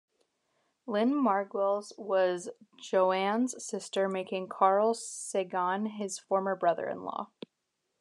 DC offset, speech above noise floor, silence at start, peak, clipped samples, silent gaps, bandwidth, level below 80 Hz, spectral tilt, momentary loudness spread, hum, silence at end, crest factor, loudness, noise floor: under 0.1%; 52 dB; 0.85 s; -12 dBFS; under 0.1%; none; 12 kHz; under -90 dBFS; -4.5 dB/octave; 12 LU; none; 0.75 s; 20 dB; -30 LUFS; -82 dBFS